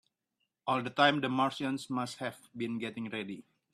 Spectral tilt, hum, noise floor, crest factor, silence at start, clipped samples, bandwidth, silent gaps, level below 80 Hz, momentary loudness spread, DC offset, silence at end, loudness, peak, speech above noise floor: -5 dB/octave; none; -83 dBFS; 24 dB; 0.65 s; under 0.1%; 13.5 kHz; none; -76 dBFS; 14 LU; under 0.1%; 0.3 s; -33 LUFS; -10 dBFS; 51 dB